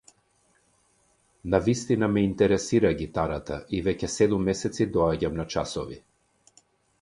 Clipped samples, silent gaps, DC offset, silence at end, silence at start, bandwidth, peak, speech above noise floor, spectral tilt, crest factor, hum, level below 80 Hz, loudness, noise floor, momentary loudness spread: under 0.1%; none; under 0.1%; 1.05 s; 1.45 s; 11.5 kHz; -6 dBFS; 42 dB; -6 dB/octave; 22 dB; none; -46 dBFS; -26 LUFS; -66 dBFS; 10 LU